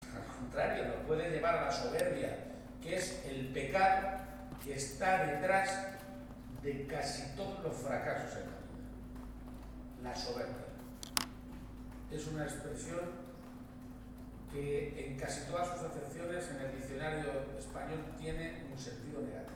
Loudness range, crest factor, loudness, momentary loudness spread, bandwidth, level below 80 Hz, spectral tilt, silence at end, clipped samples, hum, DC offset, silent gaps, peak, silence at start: 8 LU; 28 dB; -39 LUFS; 17 LU; over 20 kHz; -54 dBFS; -4.5 dB/octave; 0 s; under 0.1%; none; under 0.1%; none; -10 dBFS; 0 s